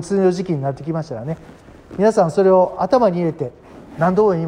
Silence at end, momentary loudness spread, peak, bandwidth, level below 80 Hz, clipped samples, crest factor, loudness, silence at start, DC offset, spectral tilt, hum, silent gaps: 0 s; 15 LU; -4 dBFS; 10.5 kHz; -52 dBFS; under 0.1%; 14 dB; -17 LUFS; 0 s; under 0.1%; -7.5 dB/octave; none; none